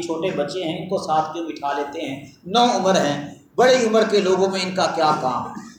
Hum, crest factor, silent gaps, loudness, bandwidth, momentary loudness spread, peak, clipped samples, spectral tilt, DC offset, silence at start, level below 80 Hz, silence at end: none; 16 dB; none; -20 LUFS; 19 kHz; 11 LU; -4 dBFS; under 0.1%; -4.5 dB/octave; under 0.1%; 0 s; -62 dBFS; 0.05 s